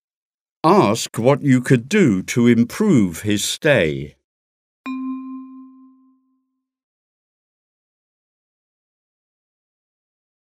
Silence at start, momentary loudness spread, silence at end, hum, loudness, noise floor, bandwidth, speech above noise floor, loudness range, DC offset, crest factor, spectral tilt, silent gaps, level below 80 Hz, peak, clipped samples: 0.65 s; 16 LU; 4.8 s; none; -17 LUFS; -72 dBFS; 15.5 kHz; 56 dB; 19 LU; under 0.1%; 20 dB; -5.5 dB/octave; 4.24-4.84 s; -56 dBFS; 0 dBFS; under 0.1%